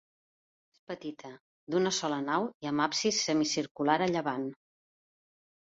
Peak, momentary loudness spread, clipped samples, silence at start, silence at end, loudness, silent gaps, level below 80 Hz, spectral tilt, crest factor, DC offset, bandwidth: -12 dBFS; 14 LU; under 0.1%; 0.9 s; 1.15 s; -31 LUFS; 1.41-1.67 s, 2.54-2.60 s, 3.71-3.75 s; -74 dBFS; -3.5 dB/octave; 20 dB; under 0.1%; 8 kHz